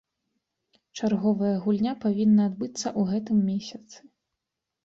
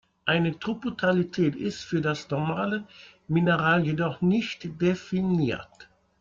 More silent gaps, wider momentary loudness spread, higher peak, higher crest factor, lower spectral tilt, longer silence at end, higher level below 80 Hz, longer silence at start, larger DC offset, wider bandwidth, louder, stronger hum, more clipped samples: neither; first, 11 LU vs 8 LU; second, -12 dBFS vs -8 dBFS; about the same, 14 dB vs 18 dB; about the same, -6.5 dB/octave vs -7 dB/octave; first, 0.9 s vs 0.35 s; second, -66 dBFS vs -60 dBFS; first, 0.95 s vs 0.25 s; neither; about the same, 7.8 kHz vs 7.4 kHz; about the same, -25 LUFS vs -26 LUFS; neither; neither